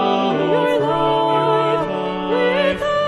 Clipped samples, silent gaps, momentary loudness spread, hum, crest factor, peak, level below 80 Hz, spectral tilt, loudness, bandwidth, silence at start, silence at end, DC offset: under 0.1%; none; 4 LU; none; 12 dB; -4 dBFS; -48 dBFS; -6 dB/octave; -18 LUFS; 12.5 kHz; 0 s; 0 s; under 0.1%